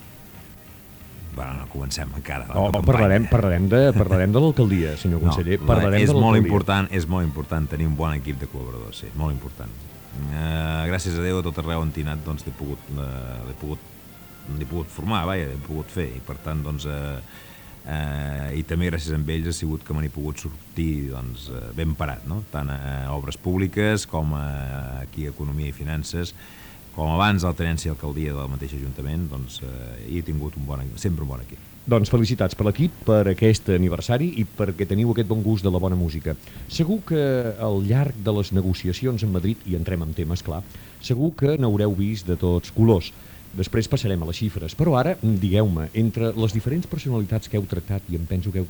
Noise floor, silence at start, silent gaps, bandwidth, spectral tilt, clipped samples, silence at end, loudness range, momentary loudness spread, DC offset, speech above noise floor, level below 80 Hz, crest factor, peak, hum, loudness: -44 dBFS; 0 s; none; over 20 kHz; -7 dB/octave; under 0.1%; 0 s; 10 LU; 15 LU; under 0.1%; 21 dB; -36 dBFS; 22 dB; -2 dBFS; none; -24 LUFS